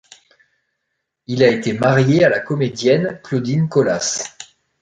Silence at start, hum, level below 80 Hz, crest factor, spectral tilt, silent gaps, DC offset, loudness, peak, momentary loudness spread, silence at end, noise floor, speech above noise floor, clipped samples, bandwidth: 1.3 s; none; -56 dBFS; 18 dB; -5.5 dB/octave; none; under 0.1%; -17 LUFS; 0 dBFS; 9 LU; 0.4 s; -75 dBFS; 59 dB; under 0.1%; 9.4 kHz